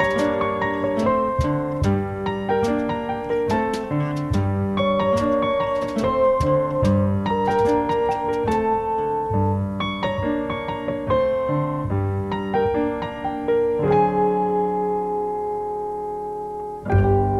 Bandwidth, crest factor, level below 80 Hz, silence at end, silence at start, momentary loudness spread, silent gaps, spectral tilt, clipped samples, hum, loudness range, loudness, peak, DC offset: 12 kHz; 16 dB; -40 dBFS; 0 s; 0 s; 7 LU; none; -7.5 dB/octave; under 0.1%; none; 3 LU; -22 LUFS; -4 dBFS; under 0.1%